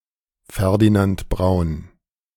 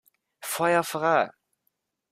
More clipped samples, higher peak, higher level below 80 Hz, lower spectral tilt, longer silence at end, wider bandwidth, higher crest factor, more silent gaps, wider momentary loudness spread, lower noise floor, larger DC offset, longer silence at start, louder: neither; first, -4 dBFS vs -8 dBFS; first, -34 dBFS vs -74 dBFS; first, -7.5 dB/octave vs -4 dB/octave; second, 0.5 s vs 0.8 s; about the same, 17 kHz vs 16 kHz; about the same, 16 dB vs 20 dB; neither; first, 14 LU vs 10 LU; second, -54 dBFS vs -77 dBFS; neither; about the same, 0.5 s vs 0.4 s; first, -19 LUFS vs -25 LUFS